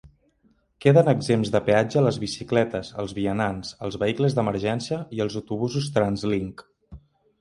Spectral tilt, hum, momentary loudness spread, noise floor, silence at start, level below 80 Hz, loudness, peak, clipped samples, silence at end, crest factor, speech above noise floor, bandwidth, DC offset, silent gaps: -6.5 dB/octave; none; 11 LU; -64 dBFS; 0.05 s; -52 dBFS; -24 LUFS; -4 dBFS; under 0.1%; 0.45 s; 20 dB; 41 dB; 11.5 kHz; under 0.1%; none